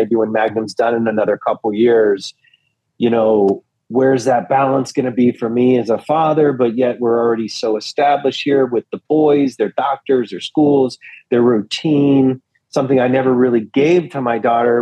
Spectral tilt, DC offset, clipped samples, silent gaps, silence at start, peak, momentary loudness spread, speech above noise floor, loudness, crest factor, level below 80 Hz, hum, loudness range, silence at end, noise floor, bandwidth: -6.5 dB/octave; under 0.1%; under 0.1%; none; 0 s; -4 dBFS; 6 LU; 45 dB; -15 LUFS; 12 dB; -66 dBFS; none; 1 LU; 0 s; -60 dBFS; 10 kHz